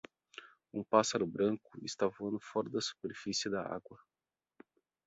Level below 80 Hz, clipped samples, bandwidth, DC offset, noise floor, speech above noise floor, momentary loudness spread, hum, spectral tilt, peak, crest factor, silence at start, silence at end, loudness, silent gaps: -74 dBFS; under 0.1%; 8 kHz; under 0.1%; -89 dBFS; 53 dB; 17 LU; none; -3.5 dB/octave; -12 dBFS; 26 dB; 0.35 s; 1.1 s; -36 LUFS; none